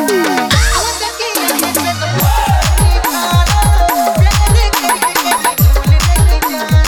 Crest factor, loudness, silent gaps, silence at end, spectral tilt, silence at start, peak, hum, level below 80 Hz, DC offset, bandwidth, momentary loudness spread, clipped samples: 10 dB; -12 LUFS; none; 0 s; -4 dB/octave; 0 s; 0 dBFS; none; -14 dBFS; under 0.1%; over 20 kHz; 4 LU; under 0.1%